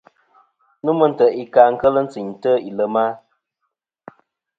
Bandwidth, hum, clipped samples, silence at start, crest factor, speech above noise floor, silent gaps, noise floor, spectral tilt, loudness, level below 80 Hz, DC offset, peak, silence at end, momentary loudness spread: 7.4 kHz; none; under 0.1%; 0.85 s; 20 dB; 60 dB; none; -77 dBFS; -8 dB/octave; -17 LUFS; -60 dBFS; under 0.1%; 0 dBFS; 1.4 s; 11 LU